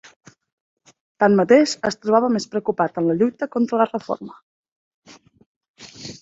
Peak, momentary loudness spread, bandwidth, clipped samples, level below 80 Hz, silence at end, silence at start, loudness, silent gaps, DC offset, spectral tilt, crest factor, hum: -2 dBFS; 15 LU; 7.8 kHz; under 0.1%; -64 dBFS; 0.05 s; 1.2 s; -19 LUFS; 4.42-4.64 s, 4.72-5.02 s, 5.46-5.61 s, 5.69-5.74 s; under 0.1%; -5.5 dB/octave; 20 dB; none